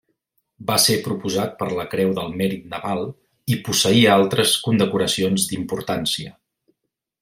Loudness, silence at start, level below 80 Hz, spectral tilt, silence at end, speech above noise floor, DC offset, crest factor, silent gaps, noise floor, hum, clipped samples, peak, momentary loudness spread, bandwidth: -20 LUFS; 0.6 s; -58 dBFS; -4 dB/octave; 0.9 s; 58 dB; under 0.1%; 20 dB; none; -78 dBFS; none; under 0.1%; -2 dBFS; 12 LU; 16.5 kHz